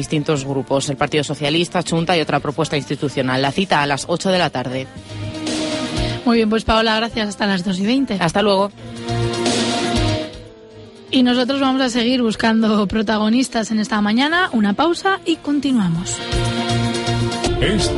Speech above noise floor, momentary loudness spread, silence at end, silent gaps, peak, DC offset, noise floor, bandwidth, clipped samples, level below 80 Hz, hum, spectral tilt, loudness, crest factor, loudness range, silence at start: 22 dB; 6 LU; 0 s; none; -4 dBFS; under 0.1%; -39 dBFS; 11.5 kHz; under 0.1%; -36 dBFS; none; -5 dB/octave; -18 LUFS; 14 dB; 3 LU; 0 s